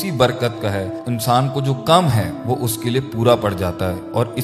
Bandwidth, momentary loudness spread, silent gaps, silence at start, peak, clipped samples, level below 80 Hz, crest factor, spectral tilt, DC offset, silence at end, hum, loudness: 15.5 kHz; 8 LU; none; 0 s; 0 dBFS; under 0.1%; -46 dBFS; 18 dB; -5.5 dB/octave; under 0.1%; 0 s; none; -19 LUFS